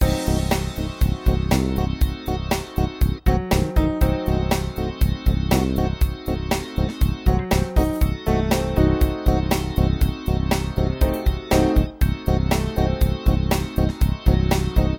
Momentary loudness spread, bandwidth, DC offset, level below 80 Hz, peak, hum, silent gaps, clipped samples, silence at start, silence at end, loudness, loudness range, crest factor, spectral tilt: 4 LU; 17.5 kHz; under 0.1%; -24 dBFS; -2 dBFS; none; none; under 0.1%; 0 s; 0 s; -22 LUFS; 2 LU; 16 dB; -6.5 dB/octave